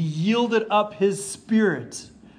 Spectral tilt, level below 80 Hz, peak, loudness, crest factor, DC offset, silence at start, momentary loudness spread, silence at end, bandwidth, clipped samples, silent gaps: -5.5 dB/octave; -64 dBFS; -8 dBFS; -22 LUFS; 14 dB; under 0.1%; 0 s; 11 LU; 0.3 s; 10.5 kHz; under 0.1%; none